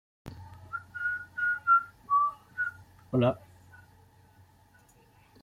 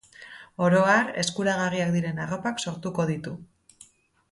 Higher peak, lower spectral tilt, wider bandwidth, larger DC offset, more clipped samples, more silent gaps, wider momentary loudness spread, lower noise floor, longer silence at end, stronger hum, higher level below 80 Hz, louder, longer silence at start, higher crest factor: second, -14 dBFS vs -8 dBFS; first, -7.5 dB/octave vs -5 dB/octave; first, 15.5 kHz vs 11.5 kHz; neither; neither; neither; about the same, 22 LU vs 20 LU; first, -61 dBFS vs -56 dBFS; first, 2.05 s vs 0.9 s; neither; about the same, -64 dBFS vs -64 dBFS; second, -29 LUFS vs -25 LUFS; about the same, 0.25 s vs 0.2 s; about the same, 18 dB vs 18 dB